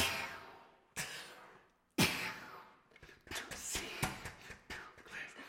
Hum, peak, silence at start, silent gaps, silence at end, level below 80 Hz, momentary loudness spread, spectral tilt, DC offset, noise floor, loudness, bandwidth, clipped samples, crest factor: none; -16 dBFS; 0 s; none; 0 s; -62 dBFS; 25 LU; -2.5 dB/octave; under 0.1%; -65 dBFS; -40 LUFS; 16.5 kHz; under 0.1%; 26 dB